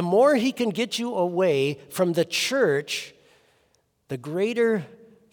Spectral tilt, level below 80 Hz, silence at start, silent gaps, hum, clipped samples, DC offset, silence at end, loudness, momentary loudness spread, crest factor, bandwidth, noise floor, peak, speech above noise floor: -4.5 dB/octave; -74 dBFS; 0 s; none; none; under 0.1%; under 0.1%; 0.4 s; -24 LUFS; 11 LU; 16 dB; over 20 kHz; -67 dBFS; -8 dBFS; 44 dB